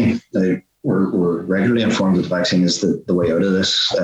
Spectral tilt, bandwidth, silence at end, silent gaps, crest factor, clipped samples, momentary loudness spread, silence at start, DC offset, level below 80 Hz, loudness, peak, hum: -5 dB/octave; 8.6 kHz; 0 s; none; 12 dB; under 0.1%; 4 LU; 0 s; under 0.1%; -52 dBFS; -18 LUFS; -6 dBFS; none